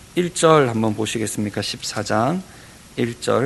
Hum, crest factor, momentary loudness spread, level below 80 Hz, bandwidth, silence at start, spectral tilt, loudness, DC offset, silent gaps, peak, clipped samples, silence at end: none; 20 dB; 11 LU; -52 dBFS; 12.5 kHz; 0.15 s; -4.5 dB/octave; -20 LUFS; under 0.1%; none; 0 dBFS; under 0.1%; 0 s